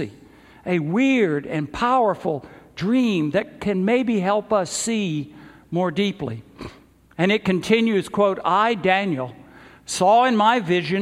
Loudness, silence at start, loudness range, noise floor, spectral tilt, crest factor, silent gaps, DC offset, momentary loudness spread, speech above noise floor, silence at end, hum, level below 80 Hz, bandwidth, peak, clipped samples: -21 LUFS; 0 s; 4 LU; -48 dBFS; -5 dB/octave; 18 dB; none; under 0.1%; 15 LU; 27 dB; 0 s; none; -54 dBFS; 15 kHz; -4 dBFS; under 0.1%